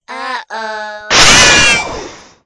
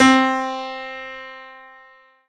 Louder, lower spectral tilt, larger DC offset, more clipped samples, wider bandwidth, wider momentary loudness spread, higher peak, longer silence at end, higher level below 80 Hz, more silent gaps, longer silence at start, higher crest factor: first, -6 LUFS vs -21 LUFS; second, -0.5 dB/octave vs -3 dB/octave; neither; first, 1% vs under 0.1%; first, 12 kHz vs 10 kHz; second, 19 LU vs 24 LU; about the same, 0 dBFS vs 0 dBFS; second, 0 s vs 0.65 s; first, -32 dBFS vs -58 dBFS; neither; about the same, 0 s vs 0 s; second, 12 dB vs 20 dB